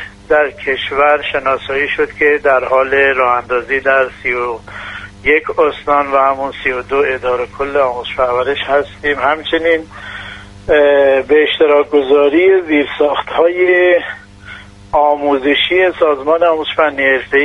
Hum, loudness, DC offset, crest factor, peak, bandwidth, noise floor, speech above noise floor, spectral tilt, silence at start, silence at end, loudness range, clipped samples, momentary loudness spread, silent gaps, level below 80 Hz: none; -13 LUFS; under 0.1%; 12 dB; 0 dBFS; 9.6 kHz; -34 dBFS; 21 dB; -5.5 dB/octave; 0 s; 0 s; 4 LU; under 0.1%; 8 LU; none; -42 dBFS